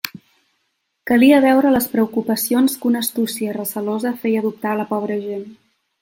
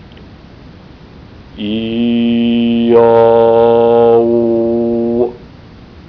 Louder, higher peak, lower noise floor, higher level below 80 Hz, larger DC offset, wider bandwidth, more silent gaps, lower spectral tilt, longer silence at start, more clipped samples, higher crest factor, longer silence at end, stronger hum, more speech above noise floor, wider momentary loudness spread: second, -18 LUFS vs -11 LUFS; about the same, 0 dBFS vs 0 dBFS; first, -71 dBFS vs -36 dBFS; second, -60 dBFS vs -42 dBFS; second, under 0.1% vs 0.1%; first, 17 kHz vs 5.4 kHz; neither; second, -4.5 dB/octave vs -9.5 dB/octave; second, 0.05 s vs 0.2 s; neither; first, 18 dB vs 12 dB; first, 0.5 s vs 0.05 s; neither; first, 53 dB vs 26 dB; first, 12 LU vs 9 LU